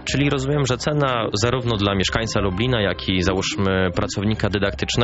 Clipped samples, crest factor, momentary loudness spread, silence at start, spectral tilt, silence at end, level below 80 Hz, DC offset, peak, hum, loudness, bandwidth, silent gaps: under 0.1%; 16 dB; 2 LU; 0 s; -4.5 dB/octave; 0 s; -36 dBFS; under 0.1%; -4 dBFS; none; -21 LUFS; 8 kHz; none